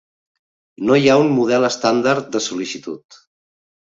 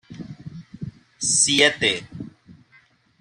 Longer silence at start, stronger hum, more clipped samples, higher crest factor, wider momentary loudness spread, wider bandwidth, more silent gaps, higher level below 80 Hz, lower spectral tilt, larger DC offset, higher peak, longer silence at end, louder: first, 0.8 s vs 0.1 s; neither; neither; about the same, 18 dB vs 22 dB; second, 15 LU vs 24 LU; second, 7.8 kHz vs 13.5 kHz; neither; about the same, -62 dBFS vs -58 dBFS; first, -5 dB/octave vs -1.5 dB/octave; neither; about the same, -2 dBFS vs -2 dBFS; first, 0.95 s vs 0.7 s; about the same, -17 LUFS vs -18 LUFS